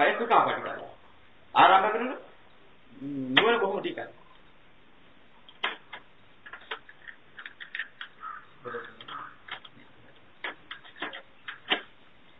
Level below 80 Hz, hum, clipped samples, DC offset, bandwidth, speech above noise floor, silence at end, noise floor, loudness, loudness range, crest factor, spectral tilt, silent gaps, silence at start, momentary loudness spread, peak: -72 dBFS; none; under 0.1%; 0.2%; 5.2 kHz; 35 dB; 0.55 s; -59 dBFS; -27 LUFS; 16 LU; 28 dB; -6 dB/octave; none; 0 s; 23 LU; -4 dBFS